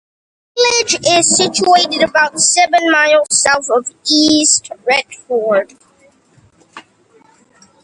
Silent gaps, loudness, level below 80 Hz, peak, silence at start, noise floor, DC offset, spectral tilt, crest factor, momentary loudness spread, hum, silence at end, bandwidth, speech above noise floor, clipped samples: none; -12 LUFS; -56 dBFS; 0 dBFS; 0.55 s; -51 dBFS; under 0.1%; -1 dB/octave; 14 dB; 7 LU; none; 1.05 s; 11.5 kHz; 38 dB; under 0.1%